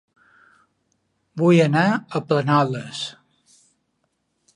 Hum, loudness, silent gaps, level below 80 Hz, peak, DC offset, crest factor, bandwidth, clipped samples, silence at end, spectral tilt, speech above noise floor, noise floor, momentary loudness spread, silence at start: none; -20 LUFS; none; -70 dBFS; -4 dBFS; under 0.1%; 20 dB; 10.5 kHz; under 0.1%; 1.45 s; -6.5 dB/octave; 53 dB; -72 dBFS; 15 LU; 1.35 s